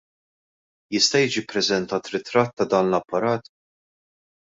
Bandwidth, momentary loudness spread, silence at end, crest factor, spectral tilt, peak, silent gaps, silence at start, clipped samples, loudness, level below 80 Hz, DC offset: 8 kHz; 9 LU; 1 s; 20 dB; -3.5 dB/octave; -4 dBFS; 2.53-2.57 s; 0.9 s; under 0.1%; -22 LUFS; -64 dBFS; under 0.1%